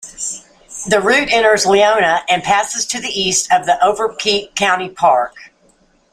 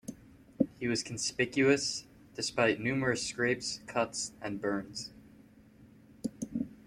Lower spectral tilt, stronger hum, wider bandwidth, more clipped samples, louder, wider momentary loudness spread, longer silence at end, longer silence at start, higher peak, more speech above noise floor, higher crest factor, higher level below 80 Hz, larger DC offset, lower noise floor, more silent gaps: second, -1.5 dB/octave vs -3.5 dB/octave; neither; about the same, 15.5 kHz vs 14.5 kHz; neither; first, -14 LUFS vs -32 LUFS; about the same, 12 LU vs 14 LU; first, 0.65 s vs 0.05 s; about the same, 0 s vs 0.05 s; first, 0 dBFS vs -12 dBFS; first, 40 dB vs 26 dB; second, 14 dB vs 22 dB; first, -50 dBFS vs -64 dBFS; neither; second, -54 dBFS vs -58 dBFS; neither